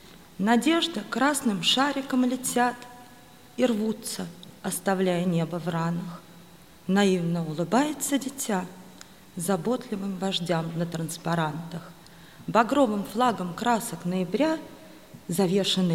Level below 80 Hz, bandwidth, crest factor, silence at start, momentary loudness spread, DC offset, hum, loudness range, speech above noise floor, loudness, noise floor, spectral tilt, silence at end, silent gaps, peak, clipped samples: -64 dBFS; 16.5 kHz; 20 dB; 0.05 s; 17 LU; 0.1%; none; 4 LU; 25 dB; -26 LUFS; -51 dBFS; -4.5 dB/octave; 0 s; none; -6 dBFS; under 0.1%